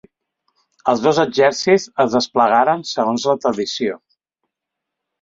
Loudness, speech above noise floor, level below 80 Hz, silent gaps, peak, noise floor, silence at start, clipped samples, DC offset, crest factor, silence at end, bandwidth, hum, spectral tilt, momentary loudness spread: -17 LUFS; 65 dB; -62 dBFS; none; -2 dBFS; -81 dBFS; 0.85 s; under 0.1%; under 0.1%; 18 dB; 1.25 s; 7.8 kHz; none; -4 dB/octave; 9 LU